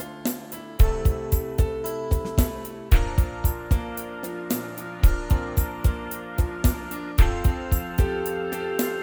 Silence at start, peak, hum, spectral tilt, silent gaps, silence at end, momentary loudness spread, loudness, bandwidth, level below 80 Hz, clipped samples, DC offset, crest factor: 0 s; -4 dBFS; none; -6 dB/octave; none; 0 s; 10 LU; -26 LUFS; over 20 kHz; -24 dBFS; under 0.1%; under 0.1%; 18 dB